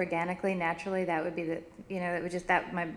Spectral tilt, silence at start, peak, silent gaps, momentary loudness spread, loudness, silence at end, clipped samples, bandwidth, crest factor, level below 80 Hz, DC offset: -6.5 dB/octave; 0 s; -12 dBFS; none; 7 LU; -32 LUFS; 0 s; under 0.1%; 12 kHz; 20 dB; -62 dBFS; under 0.1%